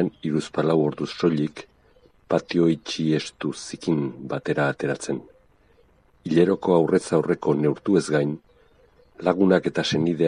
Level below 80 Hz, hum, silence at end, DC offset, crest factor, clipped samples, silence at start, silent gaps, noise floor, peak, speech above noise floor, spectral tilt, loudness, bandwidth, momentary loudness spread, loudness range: -60 dBFS; none; 0 s; under 0.1%; 20 dB; under 0.1%; 0 s; none; -58 dBFS; -4 dBFS; 36 dB; -6 dB/octave; -23 LUFS; 10.5 kHz; 11 LU; 4 LU